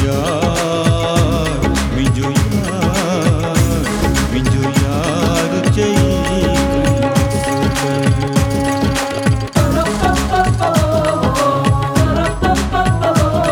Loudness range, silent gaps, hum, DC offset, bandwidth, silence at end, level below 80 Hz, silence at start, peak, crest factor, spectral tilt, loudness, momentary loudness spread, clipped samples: 1 LU; none; none; under 0.1%; 18 kHz; 0 s; -24 dBFS; 0 s; -2 dBFS; 12 dB; -5.5 dB/octave; -15 LUFS; 2 LU; under 0.1%